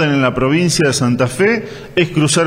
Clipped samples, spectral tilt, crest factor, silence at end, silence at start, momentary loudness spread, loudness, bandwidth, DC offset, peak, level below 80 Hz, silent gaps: under 0.1%; -4.5 dB/octave; 14 dB; 0 s; 0 s; 4 LU; -14 LUFS; 16 kHz; under 0.1%; 0 dBFS; -42 dBFS; none